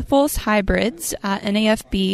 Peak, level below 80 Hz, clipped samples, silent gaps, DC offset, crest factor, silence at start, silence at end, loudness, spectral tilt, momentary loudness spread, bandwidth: -2 dBFS; -32 dBFS; under 0.1%; none; under 0.1%; 16 dB; 0 s; 0 s; -20 LUFS; -4.5 dB/octave; 5 LU; 15.5 kHz